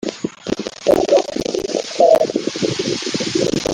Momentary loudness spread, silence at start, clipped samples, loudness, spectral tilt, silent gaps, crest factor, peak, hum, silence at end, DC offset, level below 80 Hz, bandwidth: 11 LU; 0.05 s; under 0.1%; -18 LUFS; -4 dB/octave; none; 16 dB; -2 dBFS; none; 0 s; under 0.1%; -48 dBFS; 16.5 kHz